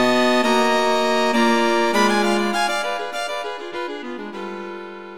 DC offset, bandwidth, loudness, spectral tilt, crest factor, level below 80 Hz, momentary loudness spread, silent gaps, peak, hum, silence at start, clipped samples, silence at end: 2%; 18 kHz; -19 LUFS; -3.5 dB/octave; 16 dB; -60 dBFS; 14 LU; none; -4 dBFS; none; 0 s; under 0.1%; 0 s